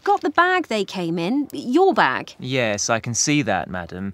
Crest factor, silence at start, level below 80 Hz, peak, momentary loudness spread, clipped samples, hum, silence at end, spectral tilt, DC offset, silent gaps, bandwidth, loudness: 18 dB; 0.05 s; -58 dBFS; -2 dBFS; 8 LU; under 0.1%; none; 0 s; -3.5 dB/octave; under 0.1%; none; 16 kHz; -20 LUFS